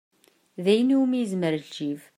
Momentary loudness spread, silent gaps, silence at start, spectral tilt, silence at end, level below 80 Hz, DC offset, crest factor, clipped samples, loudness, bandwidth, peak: 12 LU; none; 0.6 s; -6.5 dB/octave; 0.15 s; -76 dBFS; under 0.1%; 16 dB; under 0.1%; -24 LUFS; 13 kHz; -8 dBFS